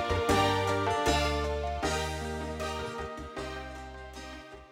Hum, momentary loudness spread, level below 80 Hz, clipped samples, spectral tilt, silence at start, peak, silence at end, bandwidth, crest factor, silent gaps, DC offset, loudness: none; 17 LU; -42 dBFS; under 0.1%; -4.5 dB/octave; 0 s; -14 dBFS; 0 s; 16.5 kHz; 18 dB; none; under 0.1%; -31 LUFS